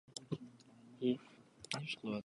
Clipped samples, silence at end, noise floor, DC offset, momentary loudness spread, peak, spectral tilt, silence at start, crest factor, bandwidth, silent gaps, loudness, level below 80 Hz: under 0.1%; 0.05 s; -61 dBFS; under 0.1%; 23 LU; -20 dBFS; -5 dB/octave; 0.1 s; 22 dB; 11 kHz; none; -42 LUFS; -80 dBFS